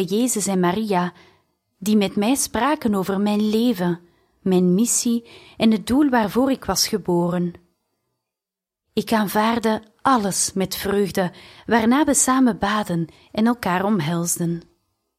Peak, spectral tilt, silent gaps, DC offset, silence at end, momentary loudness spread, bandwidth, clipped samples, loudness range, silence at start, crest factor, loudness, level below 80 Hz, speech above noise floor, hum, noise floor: -4 dBFS; -4.5 dB/octave; none; under 0.1%; 0.55 s; 9 LU; 16 kHz; under 0.1%; 4 LU; 0 s; 18 dB; -20 LUFS; -52 dBFS; 67 dB; none; -87 dBFS